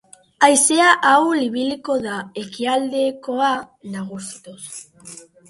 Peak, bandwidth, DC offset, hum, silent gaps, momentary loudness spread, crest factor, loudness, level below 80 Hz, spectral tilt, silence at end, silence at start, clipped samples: 0 dBFS; 12 kHz; under 0.1%; none; none; 21 LU; 18 dB; -17 LUFS; -66 dBFS; -2 dB/octave; 0.3 s; 0.4 s; under 0.1%